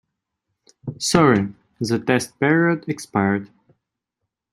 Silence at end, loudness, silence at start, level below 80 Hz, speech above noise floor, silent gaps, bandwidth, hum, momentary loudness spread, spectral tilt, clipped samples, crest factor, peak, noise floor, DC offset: 1.05 s; -20 LUFS; 0.85 s; -54 dBFS; 62 dB; none; 15 kHz; none; 14 LU; -5 dB/octave; under 0.1%; 20 dB; -2 dBFS; -81 dBFS; under 0.1%